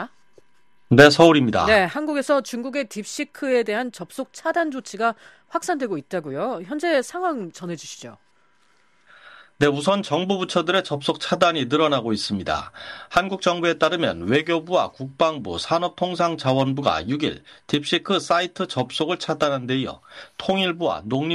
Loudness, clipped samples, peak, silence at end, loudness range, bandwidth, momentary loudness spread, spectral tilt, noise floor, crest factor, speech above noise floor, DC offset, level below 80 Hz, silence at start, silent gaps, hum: -22 LUFS; under 0.1%; 0 dBFS; 0 s; 9 LU; 13.5 kHz; 12 LU; -5 dB/octave; -65 dBFS; 22 dB; 44 dB; under 0.1%; -54 dBFS; 0 s; none; none